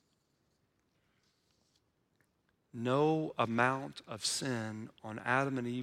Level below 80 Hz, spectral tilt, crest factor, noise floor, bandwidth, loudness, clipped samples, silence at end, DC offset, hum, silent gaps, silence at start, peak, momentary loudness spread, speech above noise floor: -78 dBFS; -4.5 dB/octave; 22 dB; -77 dBFS; 16 kHz; -34 LUFS; under 0.1%; 0 s; under 0.1%; none; none; 2.75 s; -14 dBFS; 14 LU; 43 dB